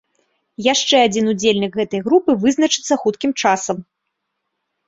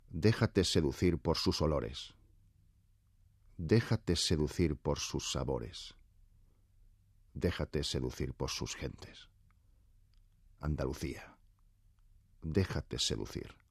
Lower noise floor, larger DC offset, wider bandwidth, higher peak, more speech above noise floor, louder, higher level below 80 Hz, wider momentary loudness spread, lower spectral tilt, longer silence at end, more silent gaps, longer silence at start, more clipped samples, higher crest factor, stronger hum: first, -75 dBFS vs -68 dBFS; neither; second, 8 kHz vs 14 kHz; first, -2 dBFS vs -16 dBFS; first, 59 dB vs 34 dB; first, -17 LUFS vs -35 LUFS; second, -60 dBFS vs -50 dBFS; second, 7 LU vs 15 LU; second, -3.5 dB/octave vs -5 dB/octave; first, 1.05 s vs 0.2 s; neither; first, 0.6 s vs 0.1 s; neither; about the same, 16 dB vs 20 dB; neither